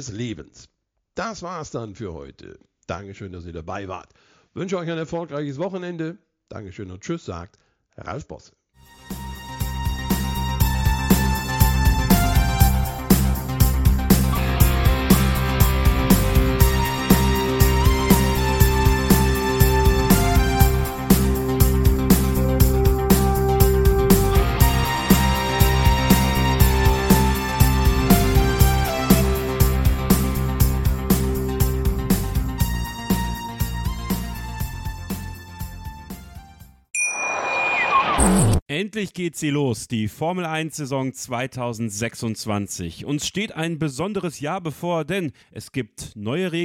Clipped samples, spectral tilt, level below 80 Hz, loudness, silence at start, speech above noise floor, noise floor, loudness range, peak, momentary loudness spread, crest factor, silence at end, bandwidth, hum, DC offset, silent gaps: under 0.1%; -5.5 dB/octave; -24 dBFS; -20 LUFS; 0 s; 22 dB; -49 dBFS; 14 LU; 0 dBFS; 16 LU; 20 dB; 0 s; 17 kHz; none; under 0.1%; 38.62-38.66 s